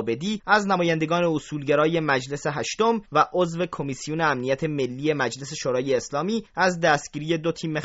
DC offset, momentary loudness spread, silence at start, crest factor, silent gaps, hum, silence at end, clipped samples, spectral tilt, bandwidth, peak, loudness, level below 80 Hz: under 0.1%; 7 LU; 0 s; 20 dB; none; none; 0 s; under 0.1%; -4 dB/octave; 8 kHz; -4 dBFS; -24 LUFS; -58 dBFS